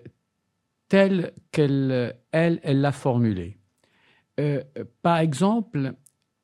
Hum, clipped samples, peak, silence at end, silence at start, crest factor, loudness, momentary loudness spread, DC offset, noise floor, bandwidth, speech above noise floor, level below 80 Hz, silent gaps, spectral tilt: none; under 0.1%; -4 dBFS; 0.5 s; 0.05 s; 20 dB; -24 LUFS; 10 LU; under 0.1%; -76 dBFS; 12 kHz; 53 dB; -64 dBFS; none; -7.5 dB/octave